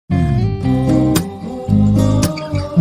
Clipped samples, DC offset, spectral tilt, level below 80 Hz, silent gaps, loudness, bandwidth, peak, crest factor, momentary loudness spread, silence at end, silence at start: under 0.1%; under 0.1%; -7 dB/octave; -30 dBFS; none; -16 LUFS; 15.5 kHz; 0 dBFS; 14 dB; 7 LU; 0 s; 0.1 s